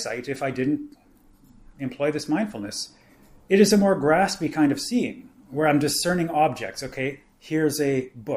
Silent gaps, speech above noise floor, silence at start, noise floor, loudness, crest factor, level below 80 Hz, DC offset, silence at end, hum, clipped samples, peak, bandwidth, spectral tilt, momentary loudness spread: none; 31 dB; 0 s; -54 dBFS; -23 LUFS; 20 dB; -56 dBFS; under 0.1%; 0 s; none; under 0.1%; -4 dBFS; 15.5 kHz; -5 dB/octave; 13 LU